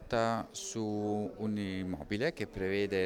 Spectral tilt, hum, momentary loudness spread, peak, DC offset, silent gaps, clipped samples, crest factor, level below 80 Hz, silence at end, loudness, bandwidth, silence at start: -5 dB/octave; none; 5 LU; -18 dBFS; under 0.1%; none; under 0.1%; 16 dB; -58 dBFS; 0 s; -35 LUFS; 16.5 kHz; 0 s